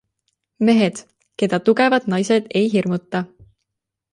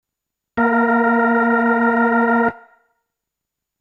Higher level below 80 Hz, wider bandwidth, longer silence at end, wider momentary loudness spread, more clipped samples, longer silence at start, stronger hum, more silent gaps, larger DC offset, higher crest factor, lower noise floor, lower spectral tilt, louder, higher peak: about the same, -62 dBFS vs -58 dBFS; first, 11 kHz vs 4 kHz; second, 0.9 s vs 1.25 s; first, 11 LU vs 5 LU; neither; about the same, 0.6 s vs 0.55 s; neither; neither; neither; about the same, 18 dB vs 14 dB; about the same, -81 dBFS vs -82 dBFS; second, -6 dB/octave vs -8 dB/octave; second, -19 LUFS vs -16 LUFS; about the same, -2 dBFS vs -4 dBFS